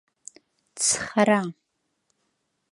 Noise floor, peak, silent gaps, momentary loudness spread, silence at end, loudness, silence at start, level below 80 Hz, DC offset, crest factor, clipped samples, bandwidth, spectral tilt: -76 dBFS; -6 dBFS; none; 5 LU; 1.2 s; -22 LUFS; 0.75 s; -66 dBFS; under 0.1%; 22 dB; under 0.1%; 11.5 kHz; -3 dB/octave